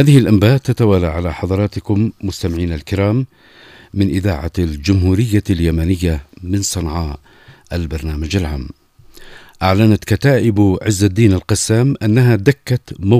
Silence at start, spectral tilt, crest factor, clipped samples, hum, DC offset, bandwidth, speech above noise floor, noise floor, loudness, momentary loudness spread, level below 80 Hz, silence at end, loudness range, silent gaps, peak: 0 s; -6.5 dB/octave; 14 dB; under 0.1%; none; under 0.1%; 15.5 kHz; 26 dB; -40 dBFS; -15 LUFS; 10 LU; -30 dBFS; 0 s; 7 LU; none; 0 dBFS